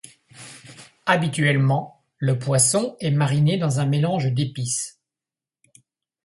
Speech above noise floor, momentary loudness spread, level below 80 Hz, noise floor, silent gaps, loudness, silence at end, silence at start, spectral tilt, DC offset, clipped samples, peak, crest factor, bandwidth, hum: over 70 dB; 19 LU; -60 dBFS; under -90 dBFS; none; -21 LUFS; 1.35 s; 0.4 s; -5 dB/octave; under 0.1%; under 0.1%; -2 dBFS; 20 dB; 11.5 kHz; none